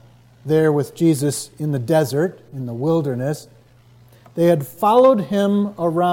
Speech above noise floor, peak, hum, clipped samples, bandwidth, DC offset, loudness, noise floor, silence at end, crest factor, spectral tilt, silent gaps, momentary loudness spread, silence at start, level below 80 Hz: 32 dB; -4 dBFS; none; under 0.1%; 17 kHz; under 0.1%; -18 LUFS; -49 dBFS; 0 s; 16 dB; -6.5 dB/octave; none; 12 LU; 0.45 s; -62 dBFS